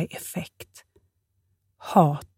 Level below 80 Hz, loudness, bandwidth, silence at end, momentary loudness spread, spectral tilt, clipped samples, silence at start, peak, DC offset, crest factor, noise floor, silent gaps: -64 dBFS; -24 LUFS; 16.5 kHz; 0.1 s; 25 LU; -6.5 dB/octave; under 0.1%; 0 s; -4 dBFS; under 0.1%; 22 dB; -72 dBFS; none